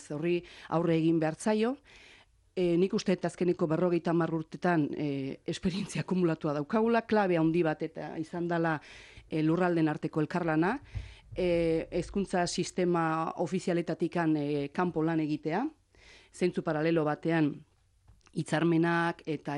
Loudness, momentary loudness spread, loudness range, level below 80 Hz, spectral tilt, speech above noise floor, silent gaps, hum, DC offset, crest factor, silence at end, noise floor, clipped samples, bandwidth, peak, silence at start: -30 LUFS; 10 LU; 2 LU; -58 dBFS; -6.5 dB/octave; 33 dB; none; none; under 0.1%; 14 dB; 0 s; -63 dBFS; under 0.1%; 11 kHz; -16 dBFS; 0 s